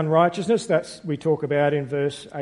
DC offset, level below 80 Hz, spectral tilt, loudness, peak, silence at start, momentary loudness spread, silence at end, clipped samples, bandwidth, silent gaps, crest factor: under 0.1%; -62 dBFS; -6.5 dB/octave; -23 LUFS; -4 dBFS; 0 s; 7 LU; 0 s; under 0.1%; 11.5 kHz; none; 18 dB